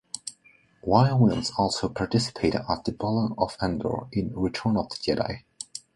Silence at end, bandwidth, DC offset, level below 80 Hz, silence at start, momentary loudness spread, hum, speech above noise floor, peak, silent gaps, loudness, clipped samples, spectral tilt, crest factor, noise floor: 0.15 s; 11.5 kHz; under 0.1%; -48 dBFS; 0.15 s; 15 LU; none; 34 dB; -4 dBFS; none; -26 LUFS; under 0.1%; -6 dB/octave; 22 dB; -60 dBFS